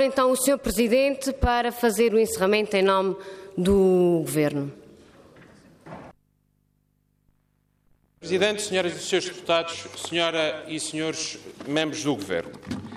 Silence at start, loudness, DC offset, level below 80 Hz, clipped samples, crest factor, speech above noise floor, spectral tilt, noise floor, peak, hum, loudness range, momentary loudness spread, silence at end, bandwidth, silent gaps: 0 s; -24 LUFS; under 0.1%; -44 dBFS; under 0.1%; 18 dB; 45 dB; -4 dB/octave; -69 dBFS; -8 dBFS; 50 Hz at -55 dBFS; 9 LU; 14 LU; 0 s; 15.5 kHz; none